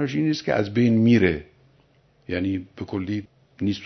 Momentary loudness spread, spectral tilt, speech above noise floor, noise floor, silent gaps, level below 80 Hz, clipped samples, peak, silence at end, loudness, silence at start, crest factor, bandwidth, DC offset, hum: 14 LU; -7.5 dB/octave; 38 dB; -60 dBFS; none; -52 dBFS; under 0.1%; -4 dBFS; 0 s; -23 LUFS; 0 s; 20 dB; 6.4 kHz; under 0.1%; none